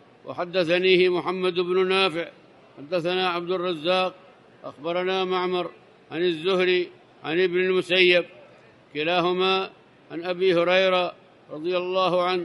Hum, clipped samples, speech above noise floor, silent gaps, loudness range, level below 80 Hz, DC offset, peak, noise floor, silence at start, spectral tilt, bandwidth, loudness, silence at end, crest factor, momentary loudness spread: none; under 0.1%; 29 dB; none; 4 LU; -74 dBFS; under 0.1%; -4 dBFS; -52 dBFS; 0.25 s; -5.5 dB/octave; 10.5 kHz; -23 LUFS; 0 s; 20 dB; 16 LU